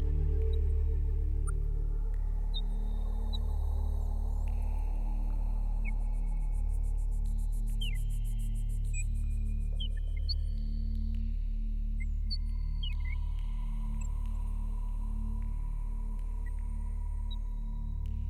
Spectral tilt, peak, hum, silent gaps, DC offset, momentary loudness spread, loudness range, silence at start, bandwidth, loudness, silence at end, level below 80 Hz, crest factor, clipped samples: -6 dB/octave; -20 dBFS; none; none; under 0.1%; 5 LU; 3 LU; 0 s; 10 kHz; -37 LUFS; 0 s; -32 dBFS; 10 dB; under 0.1%